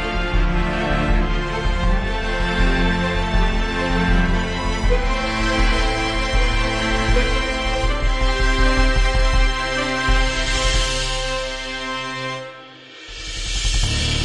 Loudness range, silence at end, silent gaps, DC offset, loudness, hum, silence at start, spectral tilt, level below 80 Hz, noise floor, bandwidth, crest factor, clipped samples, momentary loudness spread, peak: 3 LU; 0 s; none; under 0.1%; -20 LUFS; none; 0 s; -4 dB/octave; -20 dBFS; -40 dBFS; 11 kHz; 14 dB; under 0.1%; 7 LU; -4 dBFS